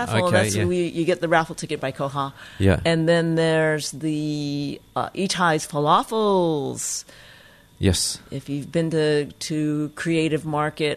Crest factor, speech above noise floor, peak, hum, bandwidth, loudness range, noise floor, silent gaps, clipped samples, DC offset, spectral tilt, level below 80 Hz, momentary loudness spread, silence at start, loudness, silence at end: 18 dB; 27 dB; -4 dBFS; none; 13.5 kHz; 3 LU; -50 dBFS; none; under 0.1%; under 0.1%; -5 dB/octave; -48 dBFS; 9 LU; 0 s; -22 LUFS; 0 s